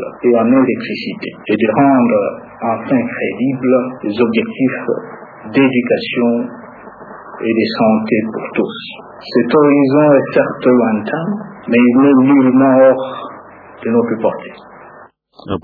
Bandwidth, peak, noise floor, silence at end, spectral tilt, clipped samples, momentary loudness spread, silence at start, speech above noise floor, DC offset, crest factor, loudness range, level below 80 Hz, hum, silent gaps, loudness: 4.9 kHz; 0 dBFS; -41 dBFS; 0.05 s; -9.5 dB/octave; under 0.1%; 16 LU; 0 s; 28 dB; under 0.1%; 14 dB; 5 LU; -58 dBFS; none; none; -14 LUFS